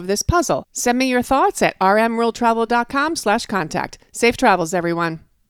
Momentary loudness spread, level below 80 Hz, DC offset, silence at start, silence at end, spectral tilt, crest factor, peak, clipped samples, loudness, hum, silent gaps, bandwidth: 6 LU; -40 dBFS; under 0.1%; 0 s; 0.3 s; -4 dB/octave; 16 dB; -2 dBFS; under 0.1%; -18 LUFS; none; none; 17.5 kHz